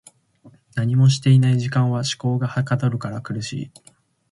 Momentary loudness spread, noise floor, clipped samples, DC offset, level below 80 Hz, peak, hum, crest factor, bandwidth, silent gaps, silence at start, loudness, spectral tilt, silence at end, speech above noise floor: 14 LU; -52 dBFS; under 0.1%; under 0.1%; -56 dBFS; -4 dBFS; none; 16 dB; 11.5 kHz; none; 0.45 s; -20 LUFS; -6 dB/octave; 0.65 s; 32 dB